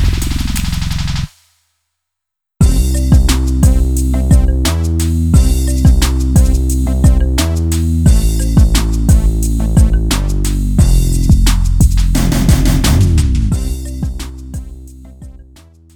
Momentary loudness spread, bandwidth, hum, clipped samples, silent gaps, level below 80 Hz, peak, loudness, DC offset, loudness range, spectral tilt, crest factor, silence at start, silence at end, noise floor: 8 LU; 18 kHz; none; under 0.1%; none; -14 dBFS; 0 dBFS; -13 LUFS; under 0.1%; 3 LU; -5.5 dB/octave; 12 dB; 0 s; 0.55 s; -80 dBFS